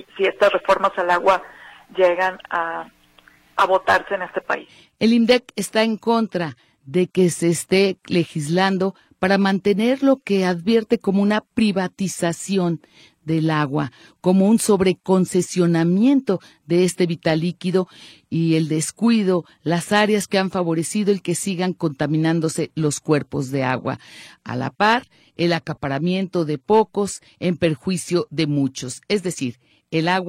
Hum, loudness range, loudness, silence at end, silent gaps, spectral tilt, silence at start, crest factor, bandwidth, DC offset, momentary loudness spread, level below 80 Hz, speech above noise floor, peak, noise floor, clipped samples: none; 3 LU; -20 LUFS; 0 s; none; -5.5 dB/octave; 0.15 s; 16 dB; 15 kHz; under 0.1%; 8 LU; -58 dBFS; 33 dB; -4 dBFS; -53 dBFS; under 0.1%